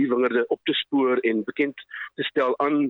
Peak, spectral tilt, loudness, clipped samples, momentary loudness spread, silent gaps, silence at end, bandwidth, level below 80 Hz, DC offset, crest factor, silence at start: -10 dBFS; -7 dB/octave; -24 LUFS; under 0.1%; 7 LU; none; 0 s; 4.3 kHz; -76 dBFS; under 0.1%; 14 dB; 0 s